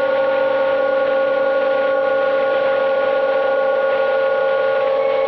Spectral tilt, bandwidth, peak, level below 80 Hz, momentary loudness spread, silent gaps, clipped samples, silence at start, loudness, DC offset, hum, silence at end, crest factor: -6 dB/octave; 5.8 kHz; -8 dBFS; -60 dBFS; 0 LU; none; under 0.1%; 0 s; -17 LUFS; under 0.1%; none; 0 s; 10 dB